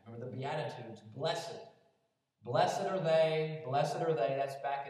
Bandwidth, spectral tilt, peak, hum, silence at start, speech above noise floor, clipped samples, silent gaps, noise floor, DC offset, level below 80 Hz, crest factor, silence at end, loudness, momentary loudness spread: 13.5 kHz; -5.5 dB/octave; -16 dBFS; none; 0.05 s; 45 dB; under 0.1%; none; -79 dBFS; under 0.1%; under -90 dBFS; 18 dB; 0 s; -34 LUFS; 17 LU